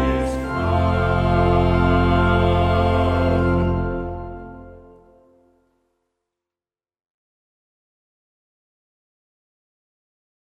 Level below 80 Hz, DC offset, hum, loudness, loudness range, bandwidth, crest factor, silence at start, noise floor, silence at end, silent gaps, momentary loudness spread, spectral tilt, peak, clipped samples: -30 dBFS; under 0.1%; none; -19 LUFS; 14 LU; 9 kHz; 18 dB; 0 s; under -90 dBFS; 5.65 s; none; 13 LU; -8 dB/octave; -4 dBFS; under 0.1%